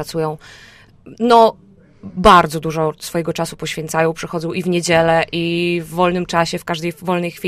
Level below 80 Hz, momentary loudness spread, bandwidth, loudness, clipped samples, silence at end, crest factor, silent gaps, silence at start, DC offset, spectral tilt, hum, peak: -42 dBFS; 11 LU; 15.5 kHz; -17 LUFS; under 0.1%; 0 s; 18 dB; none; 0 s; under 0.1%; -5 dB/octave; none; 0 dBFS